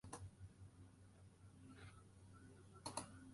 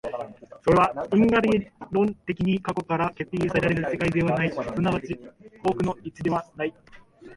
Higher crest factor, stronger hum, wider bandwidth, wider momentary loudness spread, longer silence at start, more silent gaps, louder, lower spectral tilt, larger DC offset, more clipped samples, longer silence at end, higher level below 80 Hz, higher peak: first, 28 dB vs 18 dB; neither; about the same, 11.5 kHz vs 11.5 kHz; about the same, 14 LU vs 12 LU; about the same, 0.05 s vs 0.05 s; neither; second, -58 LUFS vs -25 LUFS; second, -4 dB/octave vs -7.5 dB/octave; neither; neither; about the same, 0 s vs 0 s; second, -70 dBFS vs -50 dBFS; second, -30 dBFS vs -8 dBFS